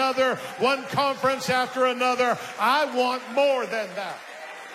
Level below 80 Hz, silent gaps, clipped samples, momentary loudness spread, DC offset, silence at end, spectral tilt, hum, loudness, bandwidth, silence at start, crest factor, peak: -70 dBFS; none; under 0.1%; 11 LU; under 0.1%; 0 s; -3.5 dB/octave; none; -24 LUFS; 15.5 kHz; 0 s; 16 dB; -10 dBFS